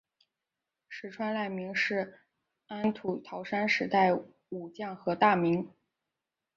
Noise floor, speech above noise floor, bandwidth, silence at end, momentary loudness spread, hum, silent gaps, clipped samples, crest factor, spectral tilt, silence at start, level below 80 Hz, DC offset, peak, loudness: -88 dBFS; 58 dB; 7.4 kHz; 0.9 s; 18 LU; none; none; under 0.1%; 22 dB; -6 dB/octave; 0.9 s; -74 dBFS; under 0.1%; -10 dBFS; -30 LUFS